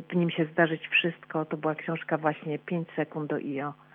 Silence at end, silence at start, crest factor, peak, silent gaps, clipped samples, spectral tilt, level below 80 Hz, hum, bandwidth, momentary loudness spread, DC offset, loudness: 0.2 s; 0 s; 20 dB; -10 dBFS; none; under 0.1%; -9 dB/octave; -86 dBFS; none; 3.8 kHz; 8 LU; under 0.1%; -29 LUFS